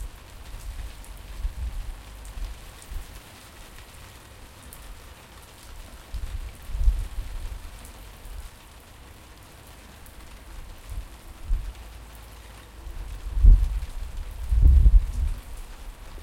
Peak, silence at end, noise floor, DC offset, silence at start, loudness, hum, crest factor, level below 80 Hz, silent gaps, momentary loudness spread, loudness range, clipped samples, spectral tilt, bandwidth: -2 dBFS; 0 s; -47 dBFS; under 0.1%; 0 s; -28 LUFS; none; 24 dB; -26 dBFS; none; 24 LU; 20 LU; under 0.1%; -5.5 dB/octave; 15.5 kHz